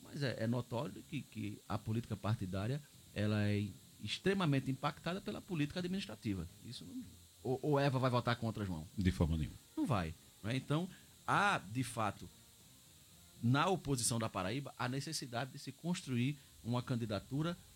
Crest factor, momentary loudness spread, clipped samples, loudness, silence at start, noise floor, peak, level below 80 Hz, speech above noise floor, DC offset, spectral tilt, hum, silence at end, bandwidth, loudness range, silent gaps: 20 dB; 12 LU; under 0.1%; -39 LUFS; 0 s; -62 dBFS; -20 dBFS; -58 dBFS; 24 dB; under 0.1%; -5.5 dB/octave; none; 0.05 s; 16.5 kHz; 3 LU; none